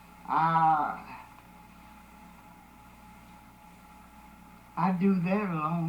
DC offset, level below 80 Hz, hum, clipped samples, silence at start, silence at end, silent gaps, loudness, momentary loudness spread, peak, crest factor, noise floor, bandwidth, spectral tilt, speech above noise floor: under 0.1%; -60 dBFS; none; under 0.1%; 0.2 s; 0 s; none; -28 LUFS; 27 LU; -14 dBFS; 16 dB; -53 dBFS; 19.5 kHz; -8.5 dB/octave; 26 dB